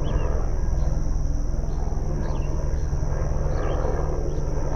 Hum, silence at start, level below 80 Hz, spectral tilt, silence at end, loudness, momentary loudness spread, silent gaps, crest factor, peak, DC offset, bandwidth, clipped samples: none; 0 s; -24 dBFS; -7.5 dB/octave; 0 s; -28 LUFS; 2 LU; none; 12 dB; -10 dBFS; under 0.1%; 6.6 kHz; under 0.1%